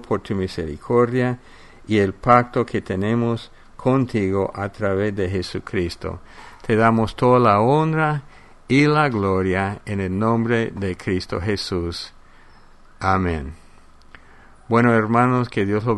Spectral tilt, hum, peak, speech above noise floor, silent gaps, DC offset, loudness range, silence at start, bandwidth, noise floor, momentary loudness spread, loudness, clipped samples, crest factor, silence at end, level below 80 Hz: -7 dB/octave; none; 0 dBFS; 27 dB; none; under 0.1%; 6 LU; 0 s; 11.5 kHz; -46 dBFS; 11 LU; -20 LUFS; under 0.1%; 20 dB; 0 s; -44 dBFS